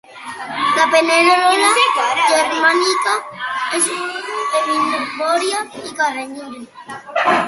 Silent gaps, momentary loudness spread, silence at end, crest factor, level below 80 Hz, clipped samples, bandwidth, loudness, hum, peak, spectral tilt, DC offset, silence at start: none; 17 LU; 0 s; 16 dB; -64 dBFS; under 0.1%; 12 kHz; -15 LUFS; none; 0 dBFS; -1 dB/octave; under 0.1%; 0.1 s